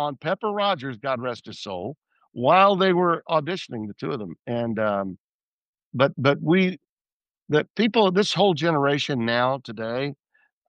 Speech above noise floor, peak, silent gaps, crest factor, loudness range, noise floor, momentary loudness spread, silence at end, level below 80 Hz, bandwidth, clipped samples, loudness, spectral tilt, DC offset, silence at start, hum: over 67 dB; -4 dBFS; 4.39-4.43 s, 5.20-5.74 s, 5.83-5.91 s, 6.89-7.05 s, 7.13-7.20 s, 7.42-7.46 s, 7.70-7.74 s; 20 dB; 4 LU; under -90 dBFS; 13 LU; 0.55 s; -70 dBFS; 9.6 kHz; under 0.1%; -23 LUFS; -6 dB/octave; under 0.1%; 0 s; none